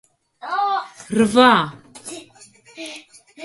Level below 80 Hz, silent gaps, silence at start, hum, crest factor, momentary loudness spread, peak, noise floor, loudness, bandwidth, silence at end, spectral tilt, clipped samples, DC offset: -58 dBFS; none; 0.45 s; none; 20 dB; 24 LU; 0 dBFS; -49 dBFS; -18 LUFS; 11.5 kHz; 0 s; -4.5 dB/octave; under 0.1%; under 0.1%